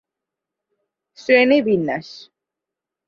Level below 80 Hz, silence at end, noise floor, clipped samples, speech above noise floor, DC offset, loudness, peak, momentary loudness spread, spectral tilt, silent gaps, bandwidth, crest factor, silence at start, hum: -66 dBFS; 0.9 s; -86 dBFS; under 0.1%; 68 dB; under 0.1%; -17 LUFS; -2 dBFS; 18 LU; -6 dB/octave; none; 7 kHz; 20 dB; 1.3 s; none